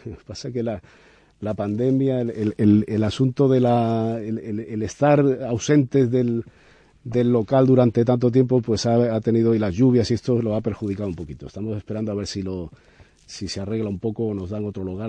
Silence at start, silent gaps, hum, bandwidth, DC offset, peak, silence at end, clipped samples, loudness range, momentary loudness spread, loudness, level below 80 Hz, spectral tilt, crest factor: 0.05 s; none; none; 9.4 kHz; under 0.1%; -6 dBFS; 0 s; under 0.1%; 9 LU; 13 LU; -21 LUFS; -50 dBFS; -7.5 dB/octave; 16 dB